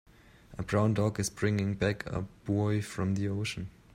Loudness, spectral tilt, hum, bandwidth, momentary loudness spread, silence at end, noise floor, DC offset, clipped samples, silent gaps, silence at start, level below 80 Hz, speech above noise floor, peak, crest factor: -31 LUFS; -6 dB/octave; none; 15 kHz; 9 LU; 0.25 s; -55 dBFS; under 0.1%; under 0.1%; none; 0.5 s; -54 dBFS; 24 dB; -14 dBFS; 18 dB